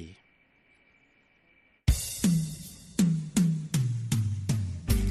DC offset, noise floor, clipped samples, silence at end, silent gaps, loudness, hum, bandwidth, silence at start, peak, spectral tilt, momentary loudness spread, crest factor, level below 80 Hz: under 0.1%; -65 dBFS; under 0.1%; 0 s; none; -29 LUFS; none; 13.5 kHz; 0 s; -10 dBFS; -5.5 dB/octave; 8 LU; 18 dB; -38 dBFS